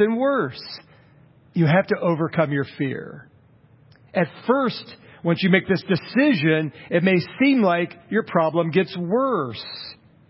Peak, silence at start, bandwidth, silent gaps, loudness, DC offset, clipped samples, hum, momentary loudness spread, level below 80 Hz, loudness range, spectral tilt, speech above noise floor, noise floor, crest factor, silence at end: -2 dBFS; 0 s; 5.8 kHz; none; -21 LUFS; under 0.1%; under 0.1%; none; 15 LU; -62 dBFS; 4 LU; -11 dB/octave; 33 dB; -54 dBFS; 18 dB; 0.35 s